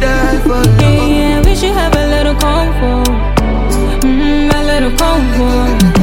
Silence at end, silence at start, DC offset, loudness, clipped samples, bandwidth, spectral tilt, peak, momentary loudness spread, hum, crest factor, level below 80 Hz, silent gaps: 0 s; 0 s; under 0.1%; -11 LUFS; under 0.1%; 17 kHz; -5.5 dB/octave; 0 dBFS; 4 LU; none; 10 dB; -14 dBFS; none